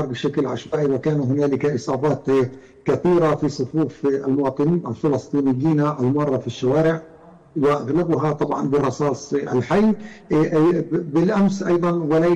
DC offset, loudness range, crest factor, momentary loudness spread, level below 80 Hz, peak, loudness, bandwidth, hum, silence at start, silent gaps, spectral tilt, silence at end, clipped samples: under 0.1%; 1 LU; 8 dB; 5 LU; -52 dBFS; -12 dBFS; -20 LUFS; 8.8 kHz; none; 0 s; none; -7.5 dB/octave; 0 s; under 0.1%